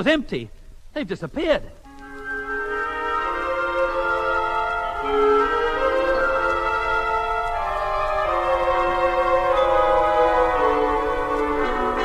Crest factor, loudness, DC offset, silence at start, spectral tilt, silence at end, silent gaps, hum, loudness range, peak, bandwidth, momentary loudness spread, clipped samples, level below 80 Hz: 16 dB; -21 LUFS; under 0.1%; 0 s; -5 dB/octave; 0 s; none; none; 6 LU; -6 dBFS; 12.5 kHz; 10 LU; under 0.1%; -38 dBFS